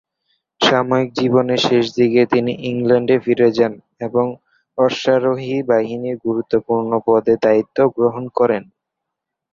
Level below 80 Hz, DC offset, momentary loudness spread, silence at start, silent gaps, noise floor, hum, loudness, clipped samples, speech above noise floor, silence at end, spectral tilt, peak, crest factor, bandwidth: -58 dBFS; under 0.1%; 7 LU; 0.6 s; none; -81 dBFS; none; -17 LUFS; under 0.1%; 65 dB; 0.9 s; -6 dB/octave; 0 dBFS; 16 dB; 7.4 kHz